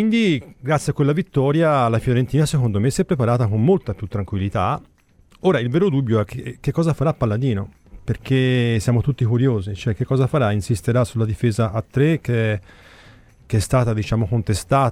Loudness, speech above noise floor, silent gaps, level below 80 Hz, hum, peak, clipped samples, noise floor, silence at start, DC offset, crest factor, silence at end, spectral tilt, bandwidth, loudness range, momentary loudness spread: -20 LUFS; 34 dB; none; -42 dBFS; none; -4 dBFS; under 0.1%; -53 dBFS; 0 s; under 0.1%; 14 dB; 0 s; -7 dB/octave; 14 kHz; 3 LU; 7 LU